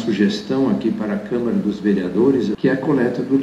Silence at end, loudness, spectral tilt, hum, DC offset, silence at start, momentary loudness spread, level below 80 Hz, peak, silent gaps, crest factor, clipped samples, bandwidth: 0 s; -19 LUFS; -7.5 dB/octave; none; under 0.1%; 0 s; 4 LU; -52 dBFS; -4 dBFS; none; 14 dB; under 0.1%; 8.6 kHz